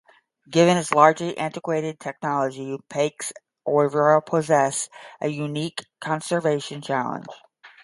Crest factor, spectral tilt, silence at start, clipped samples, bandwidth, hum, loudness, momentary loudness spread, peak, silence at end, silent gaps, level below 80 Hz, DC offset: 22 dB; -5 dB/octave; 0.5 s; under 0.1%; 11.5 kHz; none; -23 LUFS; 15 LU; 0 dBFS; 0.15 s; none; -70 dBFS; under 0.1%